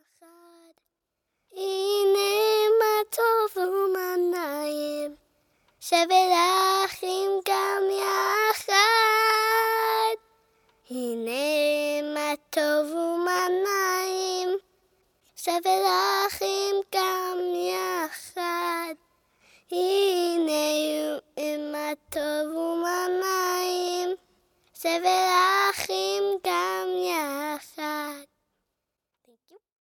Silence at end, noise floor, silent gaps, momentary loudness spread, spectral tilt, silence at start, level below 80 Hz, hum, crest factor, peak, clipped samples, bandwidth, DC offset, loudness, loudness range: 1.75 s; -84 dBFS; none; 12 LU; -1 dB/octave; 1.55 s; -72 dBFS; none; 18 dB; -8 dBFS; under 0.1%; 19 kHz; under 0.1%; -25 LUFS; 6 LU